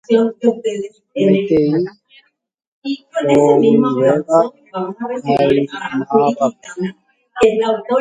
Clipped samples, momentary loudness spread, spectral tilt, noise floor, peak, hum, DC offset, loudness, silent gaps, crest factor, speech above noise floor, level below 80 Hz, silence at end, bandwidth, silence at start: under 0.1%; 13 LU; -7 dB/octave; -52 dBFS; 0 dBFS; none; under 0.1%; -16 LUFS; 2.67-2.82 s; 16 dB; 37 dB; -54 dBFS; 0 s; 9.4 kHz; 0.1 s